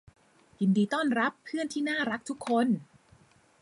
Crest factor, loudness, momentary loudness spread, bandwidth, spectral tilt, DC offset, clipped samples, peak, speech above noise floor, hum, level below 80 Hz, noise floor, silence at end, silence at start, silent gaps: 16 dB; -29 LUFS; 7 LU; 11.5 kHz; -5.5 dB/octave; under 0.1%; under 0.1%; -14 dBFS; 33 dB; none; -72 dBFS; -61 dBFS; 0.75 s; 0.6 s; none